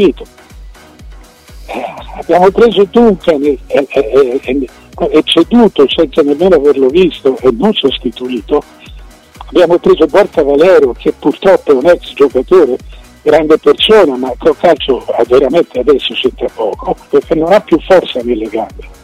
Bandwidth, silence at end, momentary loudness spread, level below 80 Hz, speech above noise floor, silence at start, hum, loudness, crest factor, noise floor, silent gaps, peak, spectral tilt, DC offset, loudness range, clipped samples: 13 kHz; 0.1 s; 10 LU; -34 dBFS; 25 dB; 0 s; none; -10 LUFS; 10 dB; -34 dBFS; none; 0 dBFS; -6 dB/octave; under 0.1%; 3 LU; under 0.1%